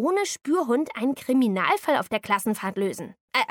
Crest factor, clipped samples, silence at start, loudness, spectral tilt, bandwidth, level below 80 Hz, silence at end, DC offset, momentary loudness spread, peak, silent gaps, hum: 18 dB; under 0.1%; 0 s; -25 LUFS; -4 dB/octave; 19 kHz; -70 dBFS; 0.05 s; under 0.1%; 6 LU; -6 dBFS; 3.20-3.28 s; none